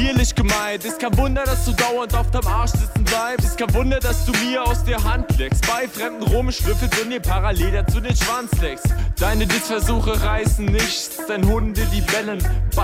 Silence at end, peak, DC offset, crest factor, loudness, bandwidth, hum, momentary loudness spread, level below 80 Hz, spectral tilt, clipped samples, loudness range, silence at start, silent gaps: 0 s; -6 dBFS; under 0.1%; 12 dB; -20 LUFS; 16.5 kHz; none; 3 LU; -22 dBFS; -4.5 dB/octave; under 0.1%; 1 LU; 0 s; none